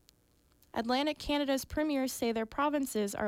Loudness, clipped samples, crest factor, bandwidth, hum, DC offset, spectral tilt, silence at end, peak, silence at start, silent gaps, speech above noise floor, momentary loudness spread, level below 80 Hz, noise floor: -33 LUFS; under 0.1%; 14 dB; 16.5 kHz; none; under 0.1%; -3.5 dB/octave; 0 s; -20 dBFS; 0.75 s; none; 36 dB; 3 LU; -56 dBFS; -68 dBFS